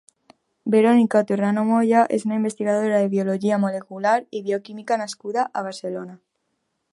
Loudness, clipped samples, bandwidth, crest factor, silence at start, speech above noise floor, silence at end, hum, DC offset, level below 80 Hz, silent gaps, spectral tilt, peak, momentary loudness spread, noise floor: -21 LUFS; under 0.1%; 11.5 kHz; 18 dB; 0.65 s; 54 dB; 0.75 s; none; under 0.1%; -74 dBFS; none; -6.5 dB/octave; -2 dBFS; 12 LU; -74 dBFS